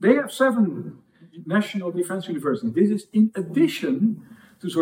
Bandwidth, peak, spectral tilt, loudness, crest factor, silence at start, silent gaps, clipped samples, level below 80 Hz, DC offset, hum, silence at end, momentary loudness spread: 16 kHz; -4 dBFS; -6.5 dB/octave; -23 LUFS; 20 dB; 0 s; none; under 0.1%; -76 dBFS; under 0.1%; none; 0 s; 14 LU